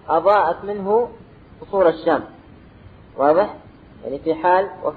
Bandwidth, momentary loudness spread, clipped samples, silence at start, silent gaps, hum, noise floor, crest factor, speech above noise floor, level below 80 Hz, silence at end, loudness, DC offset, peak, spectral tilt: 4.8 kHz; 14 LU; under 0.1%; 0.1 s; none; none; -44 dBFS; 18 dB; 26 dB; -52 dBFS; 0 s; -19 LUFS; under 0.1%; -4 dBFS; -8.5 dB/octave